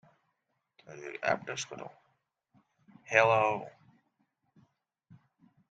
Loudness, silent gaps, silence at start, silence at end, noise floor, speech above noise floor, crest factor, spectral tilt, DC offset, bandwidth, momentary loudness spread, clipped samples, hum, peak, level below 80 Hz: -30 LUFS; none; 0.9 s; 2 s; -81 dBFS; 51 dB; 28 dB; -3.5 dB/octave; under 0.1%; 9 kHz; 24 LU; under 0.1%; none; -8 dBFS; -78 dBFS